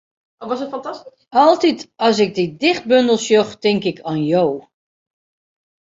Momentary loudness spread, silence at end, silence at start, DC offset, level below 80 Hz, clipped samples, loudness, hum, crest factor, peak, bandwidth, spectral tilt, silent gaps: 14 LU; 1.25 s; 0.4 s; under 0.1%; -62 dBFS; under 0.1%; -17 LUFS; none; 16 dB; -2 dBFS; 7.8 kHz; -5 dB/octave; none